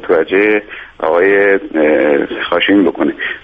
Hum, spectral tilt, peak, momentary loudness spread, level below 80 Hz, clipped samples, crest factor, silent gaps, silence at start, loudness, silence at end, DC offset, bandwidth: none; -7.5 dB/octave; -2 dBFS; 7 LU; -48 dBFS; under 0.1%; 12 dB; none; 0 s; -12 LUFS; 0.05 s; under 0.1%; 4.9 kHz